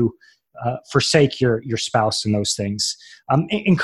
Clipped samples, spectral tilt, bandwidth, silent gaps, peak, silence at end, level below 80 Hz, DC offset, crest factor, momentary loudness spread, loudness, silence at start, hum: under 0.1%; -4.5 dB/octave; 12.5 kHz; none; -2 dBFS; 0 s; -50 dBFS; under 0.1%; 18 dB; 10 LU; -20 LUFS; 0 s; none